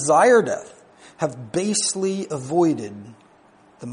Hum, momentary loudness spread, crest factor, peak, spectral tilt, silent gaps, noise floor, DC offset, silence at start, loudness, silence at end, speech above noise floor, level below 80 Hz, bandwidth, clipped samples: none; 17 LU; 18 dB; -4 dBFS; -4 dB/octave; none; -53 dBFS; under 0.1%; 0 s; -21 LUFS; 0 s; 33 dB; -66 dBFS; 10.5 kHz; under 0.1%